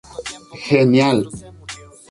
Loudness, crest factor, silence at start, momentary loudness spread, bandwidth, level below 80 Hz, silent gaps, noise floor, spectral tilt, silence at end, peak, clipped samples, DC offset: -15 LUFS; 16 dB; 0.15 s; 21 LU; 11.5 kHz; -50 dBFS; none; -37 dBFS; -6 dB/octave; 0.35 s; -2 dBFS; under 0.1%; under 0.1%